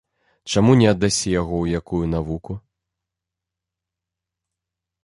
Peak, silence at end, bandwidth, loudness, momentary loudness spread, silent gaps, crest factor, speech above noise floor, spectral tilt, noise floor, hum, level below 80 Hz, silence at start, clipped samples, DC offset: -2 dBFS; 2.45 s; 11.5 kHz; -19 LUFS; 18 LU; none; 20 dB; 66 dB; -5.5 dB/octave; -85 dBFS; none; -40 dBFS; 0.45 s; under 0.1%; under 0.1%